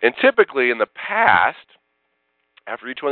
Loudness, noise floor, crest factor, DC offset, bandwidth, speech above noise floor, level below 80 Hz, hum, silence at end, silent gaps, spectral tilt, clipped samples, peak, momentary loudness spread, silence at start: -17 LUFS; -70 dBFS; 20 dB; under 0.1%; 4.5 kHz; 52 dB; -64 dBFS; none; 0 s; none; -7.5 dB/octave; under 0.1%; 0 dBFS; 15 LU; 0 s